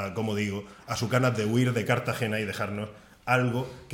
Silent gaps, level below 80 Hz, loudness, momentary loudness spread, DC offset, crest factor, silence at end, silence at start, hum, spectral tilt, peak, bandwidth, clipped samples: none; -60 dBFS; -28 LUFS; 10 LU; under 0.1%; 18 dB; 0 s; 0 s; none; -6 dB/octave; -10 dBFS; 17 kHz; under 0.1%